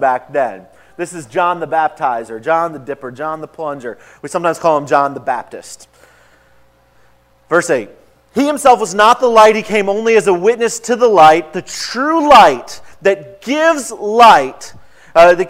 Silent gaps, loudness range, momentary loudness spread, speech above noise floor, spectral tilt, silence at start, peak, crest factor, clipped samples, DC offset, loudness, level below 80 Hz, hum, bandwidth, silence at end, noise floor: none; 8 LU; 17 LU; 38 dB; -3.5 dB/octave; 0 s; 0 dBFS; 14 dB; 0.6%; under 0.1%; -12 LUFS; -50 dBFS; none; 16 kHz; 0 s; -51 dBFS